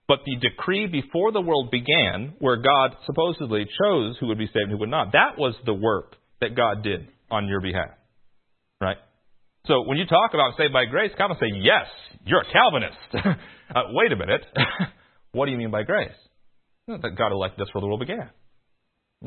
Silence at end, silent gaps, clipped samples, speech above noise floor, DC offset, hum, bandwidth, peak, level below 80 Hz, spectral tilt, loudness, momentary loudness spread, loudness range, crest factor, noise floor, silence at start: 0 s; none; under 0.1%; 49 dB; under 0.1%; none; 4.4 kHz; -2 dBFS; -54 dBFS; -10 dB/octave; -23 LUFS; 11 LU; 7 LU; 22 dB; -72 dBFS; 0.1 s